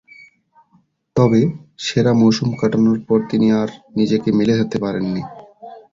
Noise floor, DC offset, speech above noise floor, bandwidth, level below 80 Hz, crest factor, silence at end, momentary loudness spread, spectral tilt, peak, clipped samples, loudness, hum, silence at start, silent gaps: -59 dBFS; under 0.1%; 42 dB; 7.6 kHz; -52 dBFS; 16 dB; 0.15 s; 10 LU; -7 dB/octave; -2 dBFS; under 0.1%; -17 LUFS; none; 1.15 s; none